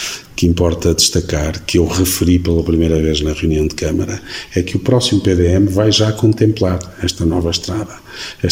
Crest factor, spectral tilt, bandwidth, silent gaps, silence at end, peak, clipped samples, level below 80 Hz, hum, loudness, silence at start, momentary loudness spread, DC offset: 14 dB; -5 dB/octave; 16.5 kHz; none; 0 s; 0 dBFS; under 0.1%; -28 dBFS; none; -15 LUFS; 0 s; 9 LU; 0.2%